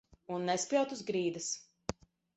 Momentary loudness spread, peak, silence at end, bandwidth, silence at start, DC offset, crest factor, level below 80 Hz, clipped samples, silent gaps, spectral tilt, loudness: 12 LU; -16 dBFS; 0.45 s; 8.4 kHz; 0.3 s; under 0.1%; 20 dB; -64 dBFS; under 0.1%; none; -3.5 dB/octave; -36 LUFS